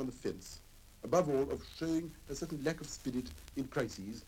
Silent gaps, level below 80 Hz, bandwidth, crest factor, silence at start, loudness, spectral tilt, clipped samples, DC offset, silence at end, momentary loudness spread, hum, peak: none; -56 dBFS; 17.5 kHz; 20 dB; 0 s; -38 LUFS; -5.5 dB/octave; under 0.1%; under 0.1%; 0 s; 13 LU; none; -18 dBFS